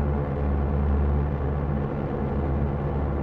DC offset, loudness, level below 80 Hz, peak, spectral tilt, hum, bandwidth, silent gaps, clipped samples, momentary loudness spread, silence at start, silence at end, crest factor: under 0.1%; -26 LUFS; -28 dBFS; -14 dBFS; -11 dB/octave; none; 3.8 kHz; none; under 0.1%; 3 LU; 0 s; 0 s; 10 dB